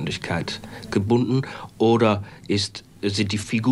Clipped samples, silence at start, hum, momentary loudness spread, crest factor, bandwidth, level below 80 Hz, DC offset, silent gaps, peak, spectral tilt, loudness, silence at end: under 0.1%; 0 s; none; 10 LU; 18 dB; 12 kHz; -54 dBFS; under 0.1%; none; -6 dBFS; -5.5 dB/octave; -23 LUFS; 0 s